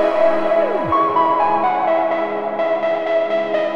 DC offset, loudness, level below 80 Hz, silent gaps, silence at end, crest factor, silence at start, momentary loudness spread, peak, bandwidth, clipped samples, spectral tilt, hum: under 0.1%; -17 LUFS; -56 dBFS; none; 0 s; 12 dB; 0 s; 4 LU; -4 dBFS; 6.4 kHz; under 0.1%; -6.5 dB/octave; none